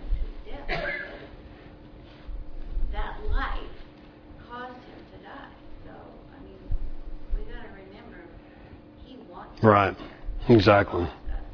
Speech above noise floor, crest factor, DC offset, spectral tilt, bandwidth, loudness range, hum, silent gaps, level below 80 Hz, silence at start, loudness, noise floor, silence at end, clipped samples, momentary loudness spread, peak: 28 dB; 26 dB; under 0.1%; -8 dB/octave; 5.4 kHz; 18 LU; none; none; -34 dBFS; 0 s; -25 LUFS; -48 dBFS; 0 s; under 0.1%; 28 LU; -2 dBFS